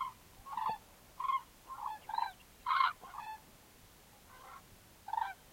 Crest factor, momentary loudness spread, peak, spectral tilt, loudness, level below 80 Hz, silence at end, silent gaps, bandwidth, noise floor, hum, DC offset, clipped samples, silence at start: 22 dB; 26 LU; -18 dBFS; -1.5 dB/octave; -39 LUFS; -68 dBFS; 0 s; none; 16.5 kHz; -61 dBFS; none; under 0.1%; under 0.1%; 0 s